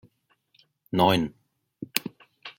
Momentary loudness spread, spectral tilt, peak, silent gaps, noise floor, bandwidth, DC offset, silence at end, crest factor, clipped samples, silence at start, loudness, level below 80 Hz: 22 LU; -5 dB/octave; 0 dBFS; none; -68 dBFS; 16.5 kHz; under 0.1%; 0.1 s; 28 dB; under 0.1%; 0.95 s; -26 LUFS; -62 dBFS